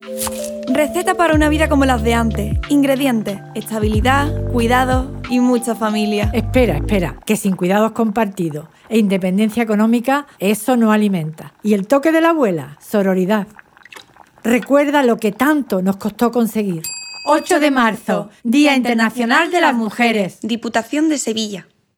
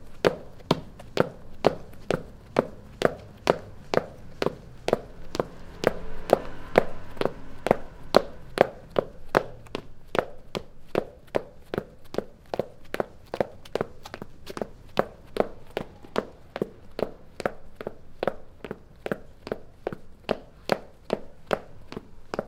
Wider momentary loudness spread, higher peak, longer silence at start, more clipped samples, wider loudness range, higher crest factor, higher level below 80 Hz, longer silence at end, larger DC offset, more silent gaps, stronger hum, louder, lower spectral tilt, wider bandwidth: second, 9 LU vs 14 LU; about the same, -2 dBFS vs 0 dBFS; about the same, 0 s vs 0 s; neither; second, 2 LU vs 8 LU; second, 14 dB vs 30 dB; first, -32 dBFS vs -46 dBFS; first, 0.35 s vs 0 s; neither; neither; neither; first, -16 LUFS vs -30 LUFS; about the same, -5.5 dB/octave vs -5.5 dB/octave; first, 20 kHz vs 17 kHz